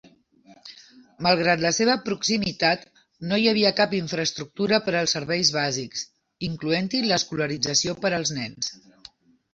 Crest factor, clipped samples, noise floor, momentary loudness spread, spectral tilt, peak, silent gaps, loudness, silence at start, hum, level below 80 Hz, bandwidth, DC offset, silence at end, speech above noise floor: 20 dB; under 0.1%; -55 dBFS; 12 LU; -3.5 dB/octave; -6 dBFS; none; -23 LUFS; 0.5 s; none; -60 dBFS; 8 kHz; under 0.1%; 0.8 s; 31 dB